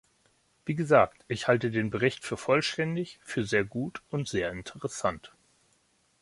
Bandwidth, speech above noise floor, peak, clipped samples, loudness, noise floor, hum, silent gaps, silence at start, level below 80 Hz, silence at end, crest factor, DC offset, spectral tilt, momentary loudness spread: 11.5 kHz; 41 dB; -6 dBFS; under 0.1%; -29 LUFS; -69 dBFS; none; none; 0.65 s; -60 dBFS; 0.95 s; 24 dB; under 0.1%; -5.5 dB/octave; 12 LU